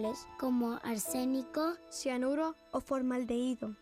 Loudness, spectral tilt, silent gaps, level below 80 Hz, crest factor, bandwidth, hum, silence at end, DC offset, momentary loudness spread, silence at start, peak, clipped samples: -35 LUFS; -4 dB/octave; none; -66 dBFS; 12 dB; 15.5 kHz; none; 0.05 s; under 0.1%; 5 LU; 0 s; -24 dBFS; under 0.1%